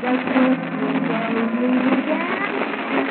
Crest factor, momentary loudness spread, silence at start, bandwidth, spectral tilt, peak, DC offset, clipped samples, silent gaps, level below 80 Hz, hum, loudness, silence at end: 16 dB; 4 LU; 0 s; 4.4 kHz; -4 dB/octave; -4 dBFS; under 0.1%; under 0.1%; none; -78 dBFS; none; -20 LUFS; 0 s